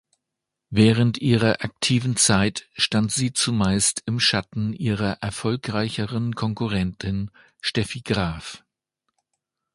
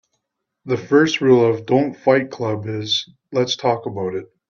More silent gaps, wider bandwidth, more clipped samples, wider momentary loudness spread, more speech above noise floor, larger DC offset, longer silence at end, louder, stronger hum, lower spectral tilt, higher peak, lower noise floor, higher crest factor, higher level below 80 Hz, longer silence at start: neither; first, 11.5 kHz vs 7.2 kHz; neither; about the same, 10 LU vs 11 LU; about the same, 61 dB vs 58 dB; neither; first, 1.2 s vs 0.25 s; second, -22 LUFS vs -19 LUFS; neither; second, -4 dB/octave vs -5.5 dB/octave; about the same, -2 dBFS vs -2 dBFS; first, -84 dBFS vs -77 dBFS; about the same, 20 dB vs 18 dB; first, -46 dBFS vs -62 dBFS; about the same, 0.7 s vs 0.65 s